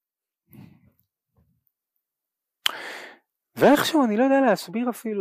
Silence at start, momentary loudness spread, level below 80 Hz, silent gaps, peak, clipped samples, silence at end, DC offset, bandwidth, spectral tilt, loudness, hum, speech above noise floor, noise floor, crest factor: 2.65 s; 18 LU; -68 dBFS; none; -6 dBFS; under 0.1%; 0 s; under 0.1%; 15.5 kHz; -4.5 dB/octave; -21 LUFS; none; 66 dB; -86 dBFS; 20 dB